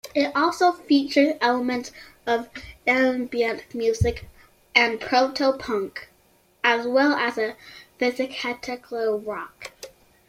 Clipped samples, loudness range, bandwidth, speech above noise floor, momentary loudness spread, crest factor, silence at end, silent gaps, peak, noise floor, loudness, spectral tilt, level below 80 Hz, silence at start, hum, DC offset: under 0.1%; 3 LU; 15.5 kHz; 37 dB; 18 LU; 22 dB; 0.4 s; none; -2 dBFS; -60 dBFS; -23 LUFS; -5 dB/octave; -48 dBFS; 0.05 s; none; under 0.1%